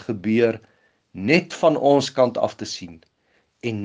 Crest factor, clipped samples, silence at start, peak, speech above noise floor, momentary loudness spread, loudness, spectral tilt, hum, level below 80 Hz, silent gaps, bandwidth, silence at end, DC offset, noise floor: 22 dB; under 0.1%; 0 s; 0 dBFS; 45 dB; 14 LU; -21 LUFS; -5.5 dB/octave; none; -66 dBFS; none; 9.8 kHz; 0 s; under 0.1%; -65 dBFS